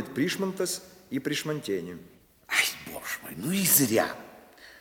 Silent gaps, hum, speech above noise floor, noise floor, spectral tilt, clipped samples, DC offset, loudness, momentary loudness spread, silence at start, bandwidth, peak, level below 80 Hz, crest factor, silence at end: none; none; 23 dB; -51 dBFS; -3 dB/octave; under 0.1%; under 0.1%; -27 LUFS; 16 LU; 0 s; 19.5 kHz; -8 dBFS; -66 dBFS; 22 dB; 0 s